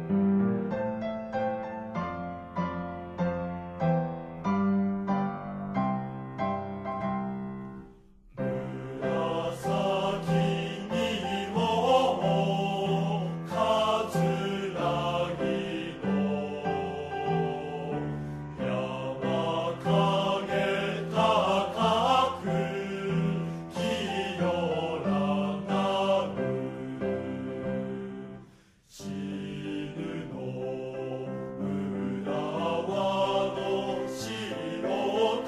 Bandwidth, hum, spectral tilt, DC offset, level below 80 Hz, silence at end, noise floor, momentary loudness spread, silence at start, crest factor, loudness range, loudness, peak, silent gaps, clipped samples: 13.5 kHz; none; -6.5 dB/octave; under 0.1%; -58 dBFS; 0 s; -57 dBFS; 10 LU; 0 s; 18 dB; 8 LU; -30 LUFS; -10 dBFS; none; under 0.1%